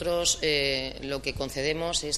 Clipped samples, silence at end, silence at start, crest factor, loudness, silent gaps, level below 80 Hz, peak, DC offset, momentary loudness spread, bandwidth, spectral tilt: under 0.1%; 0 s; 0 s; 16 dB; -27 LUFS; none; -46 dBFS; -12 dBFS; under 0.1%; 8 LU; 15 kHz; -2 dB/octave